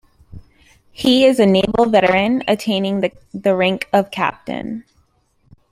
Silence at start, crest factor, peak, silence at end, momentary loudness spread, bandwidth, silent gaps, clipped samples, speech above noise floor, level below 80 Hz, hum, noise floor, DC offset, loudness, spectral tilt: 0.35 s; 16 dB; -2 dBFS; 0.9 s; 13 LU; 15.5 kHz; none; under 0.1%; 44 dB; -50 dBFS; none; -60 dBFS; under 0.1%; -16 LUFS; -5.5 dB/octave